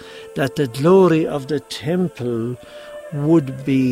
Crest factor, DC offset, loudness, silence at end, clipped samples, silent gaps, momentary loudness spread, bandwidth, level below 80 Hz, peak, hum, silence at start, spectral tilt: 16 dB; under 0.1%; -19 LUFS; 0 s; under 0.1%; none; 17 LU; 15 kHz; -56 dBFS; -4 dBFS; none; 0 s; -7.5 dB/octave